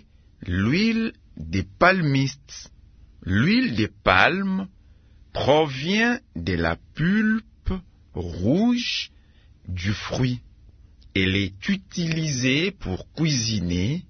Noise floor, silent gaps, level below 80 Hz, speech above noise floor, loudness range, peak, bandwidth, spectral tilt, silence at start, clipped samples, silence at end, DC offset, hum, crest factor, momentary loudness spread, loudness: -52 dBFS; none; -44 dBFS; 30 dB; 5 LU; 0 dBFS; 6.6 kHz; -5 dB/octave; 0.4 s; under 0.1%; 0.05 s; under 0.1%; none; 24 dB; 15 LU; -23 LUFS